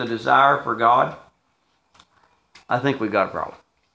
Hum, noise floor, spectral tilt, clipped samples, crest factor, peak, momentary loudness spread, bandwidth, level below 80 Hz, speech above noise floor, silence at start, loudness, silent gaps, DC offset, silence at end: none; -67 dBFS; -6.5 dB/octave; under 0.1%; 20 dB; -2 dBFS; 10 LU; 8 kHz; -62 dBFS; 47 dB; 0 s; -20 LUFS; none; under 0.1%; 0.45 s